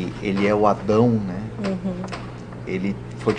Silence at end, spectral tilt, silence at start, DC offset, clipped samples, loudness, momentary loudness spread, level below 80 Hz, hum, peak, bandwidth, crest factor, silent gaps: 0 s; -7.5 dB/octave; 0 s; under 0.1%; under 0.1%; -22 LUFS; 14 LU; -46 dBFS; none; -2 dBFS; 9.8 kHz; 20 dB; none